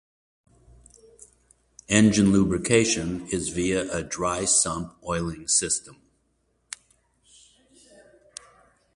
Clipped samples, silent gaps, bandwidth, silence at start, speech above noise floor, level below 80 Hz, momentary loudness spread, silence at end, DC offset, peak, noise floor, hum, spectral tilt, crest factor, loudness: under 0.1%; none; 11.5 kHz; 1.9 s; 47 dB; -50 dBFS; 22 LU; 3.05 s; under 0.1%; -4 dBFS; -70 dBFS; none; -4 dB/octave; 22 dB; -23 LUFS